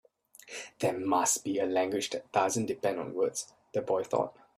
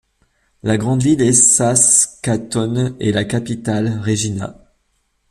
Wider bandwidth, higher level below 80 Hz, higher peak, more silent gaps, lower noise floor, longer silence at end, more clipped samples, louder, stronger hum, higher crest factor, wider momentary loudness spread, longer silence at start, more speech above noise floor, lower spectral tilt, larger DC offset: about the same, 15.5 kHz vs 14.5 kHz; second, -74 dBFS vs -48 dBFS; second, -12 dBFS vs 0 dBFS; neither; second, -55 dBFS vs -65 dBFS; second, 0.25 s vs 0.8 s; neither; second, -31 LUFS vs -15 LUFS; neither; about the same, 20 dB vs 18 dB; about the same, 9 LU vs 11 LU; second, 0.45 s vs 0.65 s; second, 24 dB vs 49 dB; about the same, -3.5 dB/octave vs -4 dB/octave; neither